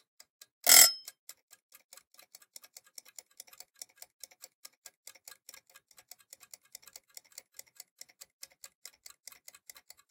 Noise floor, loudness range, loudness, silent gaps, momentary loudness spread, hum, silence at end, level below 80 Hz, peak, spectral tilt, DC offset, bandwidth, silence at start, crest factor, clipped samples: -62 dBFS; 25 LU; -20 LUFS; none; 33 LU; none; 9.15 s; -90 dBFS; -4 dBFS; 3.5 dB/octave; under 0.1%; 17 kHz; 0.65 s; 32 dB; under 0.1%